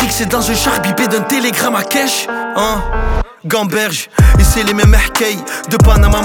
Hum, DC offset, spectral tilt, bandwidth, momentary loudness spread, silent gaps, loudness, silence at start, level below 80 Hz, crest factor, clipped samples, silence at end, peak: none; under 0.1%; -4.5 dB/octave; 19.5 kHz; 8 LU; none; -13 LUFS; 0 s; -16 dBFS; 12 dB; under 0.1%; 0 s; 0 dBFS